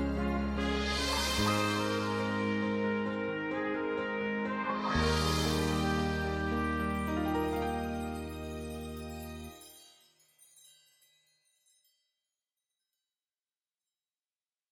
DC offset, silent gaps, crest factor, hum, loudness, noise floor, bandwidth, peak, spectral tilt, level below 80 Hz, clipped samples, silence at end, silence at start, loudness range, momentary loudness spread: under 0.1%; none; 18 dB; none; -33 LUFS; under -90 dBFS; 17 kHz; -18 dBFS; -5 dB/octave; -44 dBFS; under 0.1%; 4.85 s; 0 s; 14 LU; 12 LU